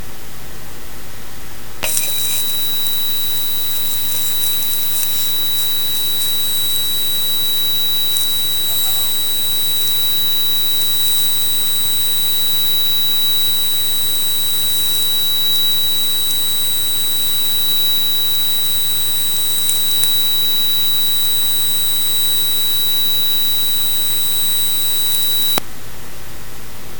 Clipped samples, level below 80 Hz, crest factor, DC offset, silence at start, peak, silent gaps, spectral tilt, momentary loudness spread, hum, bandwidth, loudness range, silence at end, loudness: under 0.1%; -42 dBFS; 18 dB; 10%; 0 s; 0 dBFS; none; 0 dB/octave; 6 LU; none; over 20 kHz; 2 LU; 0 s; -14 LUFS